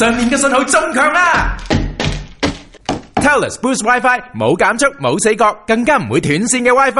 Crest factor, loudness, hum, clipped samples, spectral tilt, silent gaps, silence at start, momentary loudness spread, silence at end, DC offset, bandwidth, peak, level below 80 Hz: 14 dB; -14 LUFS; none; under 0.1%; -4 dB/octave; none; 0 s; 9 LU; 0 s; 0.1%; 11.5 kHz; 0 dBFS; -30 dBFS